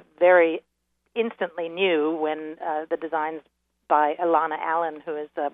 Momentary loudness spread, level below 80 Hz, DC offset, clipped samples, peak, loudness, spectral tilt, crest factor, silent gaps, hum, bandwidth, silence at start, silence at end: 13 LU; -78 dBFS; under 0.1%; under 0.1%; -6 dBFS; -24 LUFS; -7.5 dB/octave; 20 dB; none; none; 3.9 kHz; 0.2 s; 0.05 s